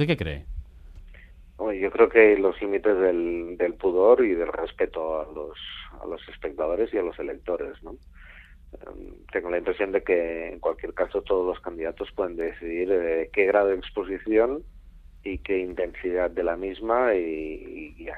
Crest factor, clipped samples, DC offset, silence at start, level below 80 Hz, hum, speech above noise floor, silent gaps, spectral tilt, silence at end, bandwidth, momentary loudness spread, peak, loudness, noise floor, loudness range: 22 dB; under 0.1%; under 0.1%; 0 s; -46 dBFS; none; 23 dB; none; -8 dB/octave; 0 s; 4.9 kHz; 17 LU; -4 dBFS; -25 LUFS; -48 dBFS; 10 LU